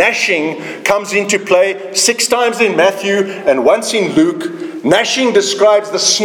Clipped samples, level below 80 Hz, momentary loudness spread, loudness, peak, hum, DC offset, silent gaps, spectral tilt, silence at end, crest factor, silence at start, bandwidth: under 0.1%; -56 dBFS; 5 LU; -13 LUFS; 0 dBFS; none; under 0.1%; none; -2.5 dB/octave; 0 s; 12 dB; 0 s; 19 kHz